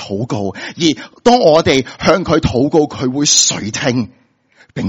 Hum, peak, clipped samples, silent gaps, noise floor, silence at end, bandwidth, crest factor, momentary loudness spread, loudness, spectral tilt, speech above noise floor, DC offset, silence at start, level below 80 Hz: none; 0 dBFS; under 0.1%; none; -51 dBFS; 0 s; over 20 kHz; 14 dB; 11 LU; -13 LUFS; -3.5 dB/octave; 37 dB; under 0.1%; 0 s; -40 dBFS